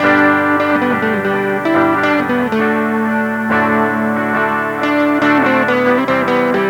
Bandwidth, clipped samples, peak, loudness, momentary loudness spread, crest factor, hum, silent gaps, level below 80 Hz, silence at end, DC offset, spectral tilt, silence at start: 19.5 kHz; under 0.1%; 0 dBFS; -14 LUFS; 4 LU; 14 dB; none; none; -54 dBFS; 0 s; under 0.1%; -6.5 dB/octave; 0 s